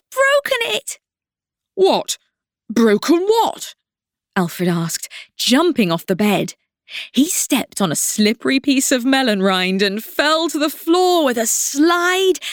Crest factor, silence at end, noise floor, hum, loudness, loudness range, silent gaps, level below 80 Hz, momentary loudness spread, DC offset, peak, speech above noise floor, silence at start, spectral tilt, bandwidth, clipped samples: 14 dB; 0 s; -90 dBFS; none; -17 LUFS; 3 LU; none; -62 dBFS; 11 LU; under 0.1%; -2 dBFS; 73 dB; 0.1 s; -3.5 dB/octave; over 20 kHz; under 0.1%